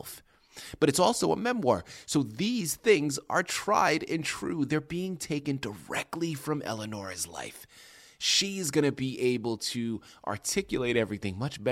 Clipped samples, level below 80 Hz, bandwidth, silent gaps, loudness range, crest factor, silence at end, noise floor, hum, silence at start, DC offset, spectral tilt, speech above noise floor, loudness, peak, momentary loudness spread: under 0.1%; -62 dBFS; 16 kHz; none; 6 LU; 20 dB; 0 s; -50 dBFS; none; 0 s; under 0.1%; -4 dB/octave; 21 dB; -29 LUFS; -10 dBFS; 11 LU